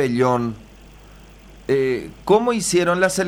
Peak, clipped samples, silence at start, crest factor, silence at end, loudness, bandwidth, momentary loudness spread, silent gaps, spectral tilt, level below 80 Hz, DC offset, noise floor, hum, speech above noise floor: -2 dBFS; under 0.1%; 0 s; 18 dB; 0 s; -19 LUFS; 19.5 kHz; 11 LU; none; -4.5 dB/octave; -48 dBFS; under 0.1%; -44 dBFS; none; 25 dB